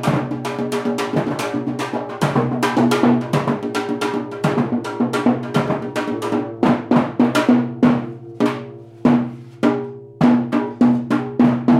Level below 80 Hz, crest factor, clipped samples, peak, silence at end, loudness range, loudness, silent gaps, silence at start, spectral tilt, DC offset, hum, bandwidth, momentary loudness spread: -56 dBFS; 14 dB; under 0.1%; -4 dBFS; 0 s; 2 LU; -19 LUFS; none; 0 s; -6.5 dB/octave; under 0.1%; none; 13.5 kHz; 7 LU